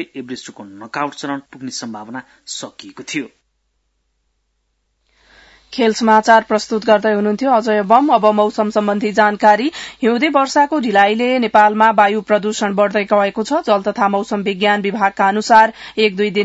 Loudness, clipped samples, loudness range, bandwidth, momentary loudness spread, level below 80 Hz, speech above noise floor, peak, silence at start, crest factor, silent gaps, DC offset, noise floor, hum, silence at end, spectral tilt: -14 LUFS; under 0.1%; 16 LU; 8 kHz; 16 LU; -60 dBFS; 52 dB; 0 dBFS; 0 s; 16 dB; none; under 0.1%; -67 dBFS; none; 0 s; -4.5 dB/octave